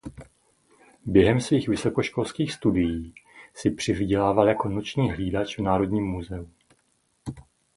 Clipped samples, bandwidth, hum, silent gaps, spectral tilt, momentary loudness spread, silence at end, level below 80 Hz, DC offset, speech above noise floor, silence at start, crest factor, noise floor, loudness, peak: under 0.1%; 11.5 kHz; none; none; -6.5 dB/octave; 20 LU; 0.35 s; -44 dBFS; under 0.1%; 45 dB; 0.05 s; 22 dB; -69 dBFS; -24 LUFS; -4 dBFS